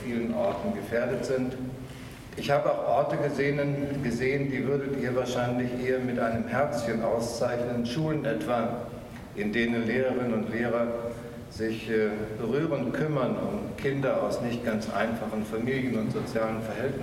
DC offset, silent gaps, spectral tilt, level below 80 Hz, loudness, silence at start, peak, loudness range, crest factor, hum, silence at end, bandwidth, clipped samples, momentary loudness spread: under 0.1%; none; -6.5 dB/octave; -52 dBFS; -29 LUFS; 0 s; -12 dBFS; 2 LU; 16 dB; none; 0 s; 16 kHz; under 0.1%; 7 LU